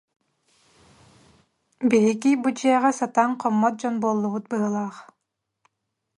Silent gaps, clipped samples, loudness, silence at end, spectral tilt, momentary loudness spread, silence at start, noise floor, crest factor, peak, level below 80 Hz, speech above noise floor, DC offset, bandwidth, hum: none; under 0.1%; -22 LUFS; 1.15 s; -5.5 dB/octave; 7 LU; 1.8 s; -80 dBFS; 18 dB; -6 dBFS; -72 dBFS; 58 dB; under 0.1%; 11.5 kHz; none